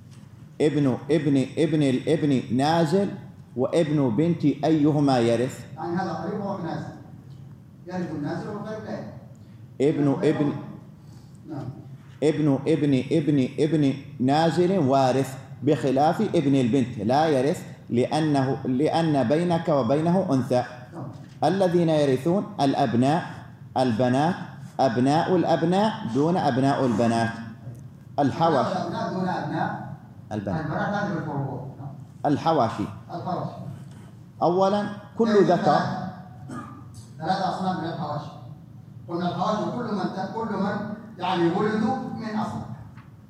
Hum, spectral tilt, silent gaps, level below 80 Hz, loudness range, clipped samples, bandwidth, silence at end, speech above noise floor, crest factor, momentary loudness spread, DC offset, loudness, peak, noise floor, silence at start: none; -7 dB/octave; none; -64 dBFS; 7 LU; under 0.1%; 13 kHz; 0.05 s; 22 dB; 18 dB; 17 LU; under 0.1%; -24 LUFS; -6 dBFS; -45 dBFS; 0.05 s